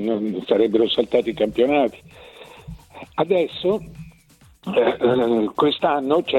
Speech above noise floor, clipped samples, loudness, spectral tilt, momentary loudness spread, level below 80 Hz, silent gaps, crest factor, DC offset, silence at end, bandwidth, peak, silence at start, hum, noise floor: 33 dB; under 0.1%; -20 LUFS; -6.5 dB/octave; 21 LU; -52 dBFS; none; 18 dB; under 0.1%; 0 s; 12 kHz; -2 dBFS; 0 s; none; -52 dBFS